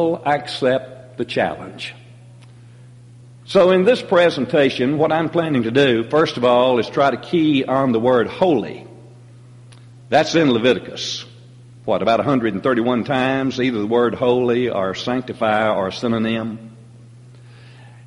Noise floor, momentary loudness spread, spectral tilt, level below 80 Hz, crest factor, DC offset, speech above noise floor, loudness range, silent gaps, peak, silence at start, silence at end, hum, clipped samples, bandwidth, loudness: -43 dBFS; 10 LU; -6 dB/octave; -56 dBFS; 16 dB; under 0.1%; 25 dB; 5 LU; none; -2 dBFS; 0 s; 0.05 s; none; under 0.1%; 11.5 kHz; -18 LUFS